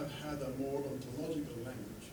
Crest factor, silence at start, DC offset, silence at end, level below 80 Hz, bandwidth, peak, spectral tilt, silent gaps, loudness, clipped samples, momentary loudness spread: 14 dB; 0 s; under 0.1%; 0 s; -60 dBFS; over 20 kHz; -26 dBFS; -6 dB/octave; none; -41 LUFS; under 0.1%; 6 LU